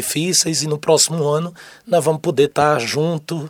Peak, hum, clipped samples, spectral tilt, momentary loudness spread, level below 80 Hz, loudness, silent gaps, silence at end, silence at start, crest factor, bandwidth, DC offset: -2 dBFS; none; under 0.1%; -3.5 dB/octave; 6 LU; -60 dBFS; -17 LUFS; none; 0 s; 0 s; 16 dB; over 20 kHz; under 0.1%